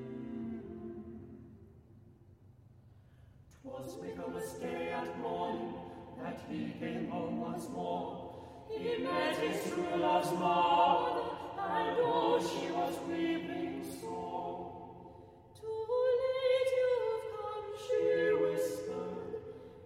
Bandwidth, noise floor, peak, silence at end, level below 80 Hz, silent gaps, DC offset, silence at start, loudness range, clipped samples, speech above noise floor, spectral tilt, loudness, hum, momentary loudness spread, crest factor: 16 kHz; -60 dBFS; -16 dBFS; 0 s; -68 dBFS; none; under 0.1%; 0 s; 15 LU; under 0.1%; 26 dB; -5.5 dB/octave; -35 LUFS; none; 17 LU; 20 dB